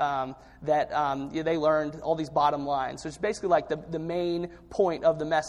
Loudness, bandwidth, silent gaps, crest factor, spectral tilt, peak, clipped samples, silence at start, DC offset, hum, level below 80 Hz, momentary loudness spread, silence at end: -28 LUFS; 11.5 kHz; none; 18 dB; -5.5 dB/octave; -10 dBFS; under 0.1%; 0 s; under 0.1%; none; -56 dBFS; 8 LU; 0 s